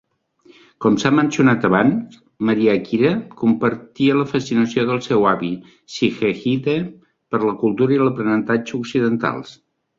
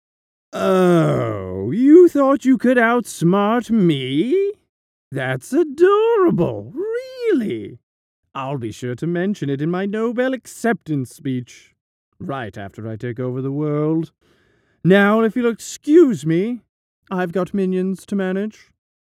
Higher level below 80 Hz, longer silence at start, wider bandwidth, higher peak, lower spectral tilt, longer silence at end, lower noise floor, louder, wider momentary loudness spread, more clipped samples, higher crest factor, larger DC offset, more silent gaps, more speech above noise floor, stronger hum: about the same, -58 dBFS vs -60 dBFS; first, 0.8 s vs 0.55 s; second, 7.6 kHz vs 14.5 kHz; about the same, -2 dBFS vs 0 dBFS; about the same, -6.5 dB/octave vs -7 dB/octave; second, 0.45 s vs 0.7 s; second, -53 dBFS vs -60 dBFS; about the same, -18 LUFS vs -18 LUFS; second, 8 LU vs 15 LU; neither; about the same, 18 dB vs 18 dB; neither; second, none vs 4.69-5.11 s, 7.83-8.23 s, 11.81-12.12 s, 16.69-17.02 s; second, 35 dB vs 42 dB; neither